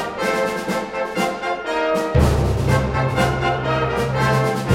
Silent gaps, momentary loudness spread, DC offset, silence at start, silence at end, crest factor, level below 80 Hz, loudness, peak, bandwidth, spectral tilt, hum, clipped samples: none; 6 LU; under 0.1%; 0 s; 0 s; 16 dB; -30 dBFS; -20 LUFS; -2 dBFS; 16 kHz; -6 dB/octave; none; under 0.1%